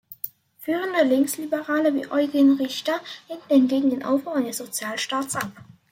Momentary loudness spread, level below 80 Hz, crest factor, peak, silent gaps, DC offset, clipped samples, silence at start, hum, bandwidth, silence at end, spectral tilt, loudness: 15 LU; -72 dBFS; 16 dB; -8 dBFS; none; under 0.1%; under 0.1%; 0.1 s; none; 16.5 kHz; 0.3 s; -3.5 dB/octave; -23 LUFS